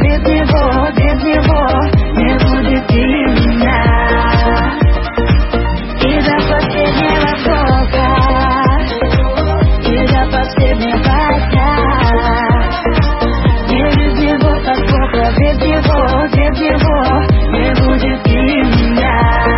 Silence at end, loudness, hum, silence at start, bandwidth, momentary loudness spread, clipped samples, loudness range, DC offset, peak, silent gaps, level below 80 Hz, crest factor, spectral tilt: 0 s; -12 LUFS; none; 0 s; 5.8 kHz; 2 LU; under 0.1%; 1 LU; under 0.1%; 0 dBFS; none; -16 dBFS; 10 dB; -11 dB/octave